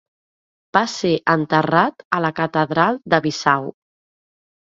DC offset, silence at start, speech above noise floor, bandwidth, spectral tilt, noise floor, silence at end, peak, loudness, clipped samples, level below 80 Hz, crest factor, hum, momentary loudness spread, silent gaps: under 0.1%; 0.75 s; over 72 dB; 7.8 kHz; -5.5 dB/octave; under -90 dBFS; 0.95 s; 0 dBFS; -18 LUFS; under 0.1%; -60 dBFS; 20 dB; none; 4 LU; 2.05-2.11 s